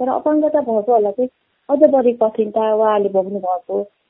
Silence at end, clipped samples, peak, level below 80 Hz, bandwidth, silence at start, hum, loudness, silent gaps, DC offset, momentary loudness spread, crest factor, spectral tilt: 0.25 s; under 0.1%; 0 dBFS; -64 dBFS; 3.7 kHz; 0 s; none; -17 LUFS; none; under 0.1%; 9 LU; 16 dB; -11 dB/octave